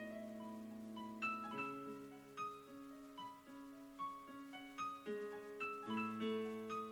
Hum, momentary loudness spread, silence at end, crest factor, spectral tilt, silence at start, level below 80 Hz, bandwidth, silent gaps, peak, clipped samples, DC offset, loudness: none; 12 LU; 0 s; 16 dB; -5 dB/octave; 0 s; -82 dBFS; 19.5 kHz; none; -30 dBFS; under 0.1%; under 0.1%; -48 LUFS